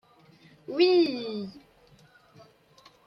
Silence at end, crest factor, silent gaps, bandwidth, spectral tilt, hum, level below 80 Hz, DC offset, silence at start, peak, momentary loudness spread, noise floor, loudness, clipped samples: 1.5 s; 20 dB; none; 6.2 kHz; -6 dB/octave; none; -74 dBFS; under 0.1%; 0.7 s; -10 dBFS; 20 LU; -58 dBFS; -26 LUFS; under 0.1%